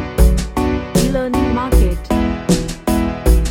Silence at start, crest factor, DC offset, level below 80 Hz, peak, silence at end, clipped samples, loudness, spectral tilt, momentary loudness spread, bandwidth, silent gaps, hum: 0 s; 14 dB; under 0.1%; -18 dBFS; 0 dBFS; 0 s; under 0.1%; -17 LUFS; -6 dB/octave; 3 LU; 17 kHz; none; none